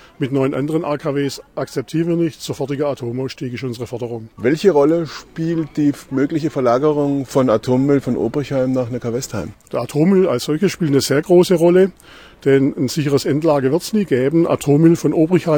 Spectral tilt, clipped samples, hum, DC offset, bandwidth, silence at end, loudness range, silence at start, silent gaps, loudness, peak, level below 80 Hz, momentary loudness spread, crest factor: -6.5 dB/octave; under 0.1%; none; under 0.1%; 18.5 kHz; 0 s; 5 LU; 0.2 s; none; -17 LUFS; 0 dBFS; -50 dBFS; 12 LU; 16 dB